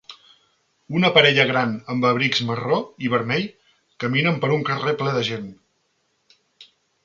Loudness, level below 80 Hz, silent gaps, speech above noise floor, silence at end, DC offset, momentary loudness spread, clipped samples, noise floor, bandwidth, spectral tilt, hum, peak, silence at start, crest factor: -20 LUFS; -62 dBFS; none; 48 dB; 0.4 s; under 0.1%; 12 LU; under 0.1%; -69 dBFS; 7.6 kHz; -5.5 dB/octave; none; -2 dBFS; 0.1 s; 22 dB